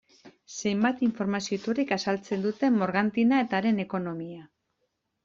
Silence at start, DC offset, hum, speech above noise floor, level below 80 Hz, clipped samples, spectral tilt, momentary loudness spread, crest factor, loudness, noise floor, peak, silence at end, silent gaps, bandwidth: 0.25 s; under 0.1%; none; 51 dB; -68 dBFS; under 0.1%; -5.5 dB/octave; 11 LU; 18 dB; -27 LUFS; -78 dBFS; -10 dBFS; 0.8 s; none; 7.6 kHz